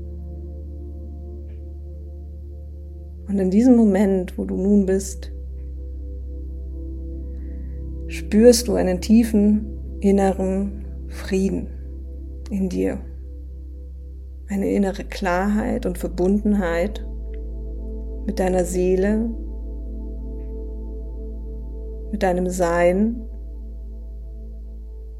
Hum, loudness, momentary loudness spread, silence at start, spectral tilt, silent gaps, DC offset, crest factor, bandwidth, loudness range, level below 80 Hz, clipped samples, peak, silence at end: none; -21 LUFS; 20 LU; 0 s; -6.5 dB/octave; none; under 0.1%; 22 dB; 15.5 kHz; 10 LU; -32 dBFS; under 0.1%; 0 dBFS; 0 s